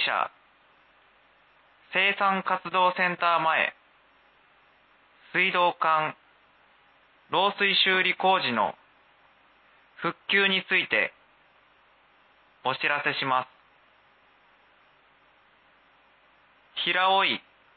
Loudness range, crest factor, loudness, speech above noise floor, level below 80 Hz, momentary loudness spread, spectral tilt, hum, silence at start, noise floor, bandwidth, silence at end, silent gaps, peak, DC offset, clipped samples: 6 LU; 20 dB; -24 LUFS; 36 dB; -80 dBFS; 10 LU; -7.5 dB/octave; none; 0 s; -61 dBFS; 4.8 kHz; 0.35 s; none; -10 dBFS; under 0.1%; under 0.1%